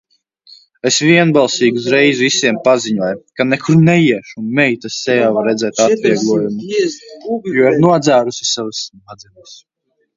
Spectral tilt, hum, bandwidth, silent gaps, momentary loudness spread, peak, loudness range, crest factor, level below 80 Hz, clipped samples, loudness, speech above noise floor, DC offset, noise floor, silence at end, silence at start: -4.5 dB/octave; none; 7.8 kHz; none; 10 LU; 0 dBFS; 3 LU; 14 dB; -58 dBFS; under 0.1%; -13 LUFS; 33 dB; under 0.1%; -46 dBFS; 0.6 s; 0.85 s